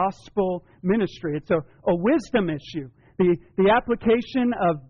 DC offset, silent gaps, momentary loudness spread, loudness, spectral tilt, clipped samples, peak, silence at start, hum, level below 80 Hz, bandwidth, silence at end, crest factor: under 0.1%; none; 10 LU; -23 LUFS; -5.5 dB/octave; under 0.1%; -10 dBFS; 0 s; none; -50 dBFS; 7.2 kHz; 0.1 s; 14 dB